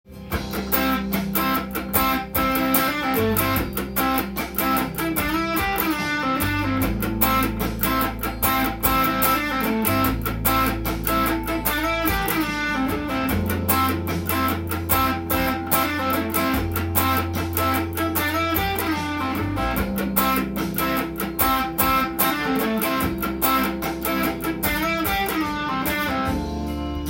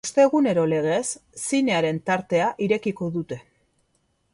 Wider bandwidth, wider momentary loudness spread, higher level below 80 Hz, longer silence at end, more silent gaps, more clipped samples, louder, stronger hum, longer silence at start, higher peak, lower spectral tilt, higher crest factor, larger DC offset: first, 17 kHz vs 11.5 kHz; second, 5 LU vs 12 LU; first, -36 dBFS vs -64 dBFS; second, 0 s vs 0.9 s; neither; neither; about the same, -22 LUFS vs -23 LUFS; neither; about the same, 0.1 s vs 0.05 s; about the same, -4 dBFS vs -6 dBFS; about the same, -4.5 dB/octave vs -5 dB/octave; about the same, 20 dB vs 18 dB; neither